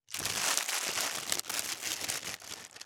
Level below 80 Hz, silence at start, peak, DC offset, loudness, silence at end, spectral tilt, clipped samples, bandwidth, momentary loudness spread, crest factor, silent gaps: -70 dBFS; 0.1 s; -4 dBFS; under 0.1%; -32 LUFS; 0 s; 0.5 dB/octave; under 0.1%; over 20 kHz; 9 LU; 30 dB; none